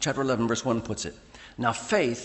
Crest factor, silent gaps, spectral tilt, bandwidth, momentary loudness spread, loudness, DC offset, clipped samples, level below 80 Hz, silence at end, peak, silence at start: 18 dB; none; -4.5 dB/octave; 8.6 kHz; 13 LU; -28 LUFS; under 0.1%; under 0.1%; -56 dBFS; 0 s; -10 dBFS; 0 s